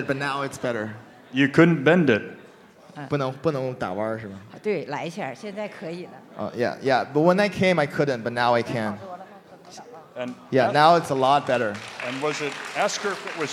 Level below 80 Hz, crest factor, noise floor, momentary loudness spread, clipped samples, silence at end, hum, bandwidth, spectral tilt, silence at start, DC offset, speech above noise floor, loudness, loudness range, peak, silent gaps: -64 dBFS; 22 dB; -49 dBFS; 18 LU; under 0.1%; 0 s; none; 15 kHz; -5.5 dB/octave; 0 s; under 0.1%; 26 dB; -23 LUFS; 7 LU; -2 dBFS; none